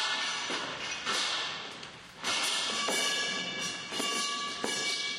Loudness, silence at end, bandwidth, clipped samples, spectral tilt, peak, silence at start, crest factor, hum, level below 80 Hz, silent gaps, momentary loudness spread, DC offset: -31 LUFS; 0 s; 15 kHz; under 0.1%; 0 dB/octave; -14 dBFS; 0 s; 20 dB; none; -72 dBFS; none; 8 LU; under 0.1%